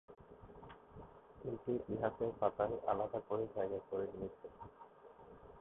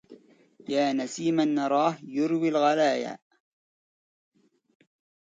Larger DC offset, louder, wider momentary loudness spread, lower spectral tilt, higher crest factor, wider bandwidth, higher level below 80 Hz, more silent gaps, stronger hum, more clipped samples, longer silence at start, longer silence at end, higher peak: neither; second, -41 LUFS vs -26 LUFS; first, 21 LU vs 10 LU; about the same, -4 dB/octave vs -5 dB/octave; about the same, 22 dB vs 18 dB; second, 3.9 kHz vs 9.2 kHz; first, -66 dBFS vs -78 dBFS; neither; neither; neither; about the same, 0.1 s vs 0.1 s; second, 0 s vs 2.05 s; second, -20 dBFS vs -12 dBFS